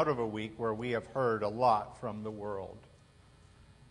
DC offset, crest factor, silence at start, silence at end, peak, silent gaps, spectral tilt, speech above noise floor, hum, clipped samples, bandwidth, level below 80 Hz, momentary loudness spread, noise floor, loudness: under 0.1%; 20 dB; 0 s; 0.2 s; -16 dBFS; none; -7 dB/octave; 27 dB; none; under 0.1%; 10.5 kHz; -64 dBFS; 12 LU; -60 dBFS; -34 LUFS